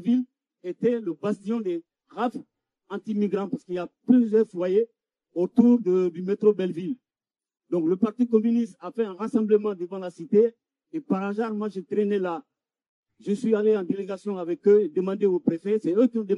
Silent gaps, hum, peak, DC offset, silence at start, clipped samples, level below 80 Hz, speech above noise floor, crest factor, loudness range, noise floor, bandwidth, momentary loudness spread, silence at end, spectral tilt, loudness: 12.89-13.03 s; none; -6 dBFS; under 0.1%; 0 s; under 0.1%; -76 dBFS; over 66 dB; 20 dB; 5 LU; under -90 dBFS; 10 kHz; 14 LU; 0 s; -8.5 dB/octave; -25 LUFS